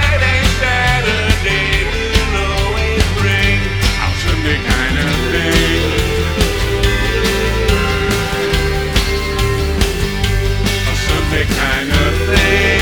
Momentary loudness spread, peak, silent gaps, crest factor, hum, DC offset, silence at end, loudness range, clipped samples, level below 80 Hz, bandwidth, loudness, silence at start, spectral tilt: 3 LU; 0 dBFS; none; 14 dB; none; under 0.1%; 0 s; 2 LU; under 0.1%; -20 dBFS; over 20 kHz; -14 LUFS; 0 s; -4.5 dB/octave